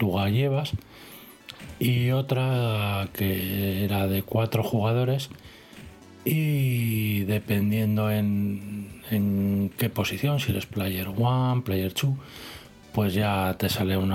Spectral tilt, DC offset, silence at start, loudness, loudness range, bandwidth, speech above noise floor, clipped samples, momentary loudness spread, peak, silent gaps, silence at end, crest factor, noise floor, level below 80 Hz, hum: -6.5 dB/octave; under 0.1%; 0 s; -26 LUFS; 1 LU; 17 kHz; 21 dB; under 0.1%; 17 LU; -10 dBFS; none; 0 s; 16 dB; -46 dBFS; -54 dBFS; none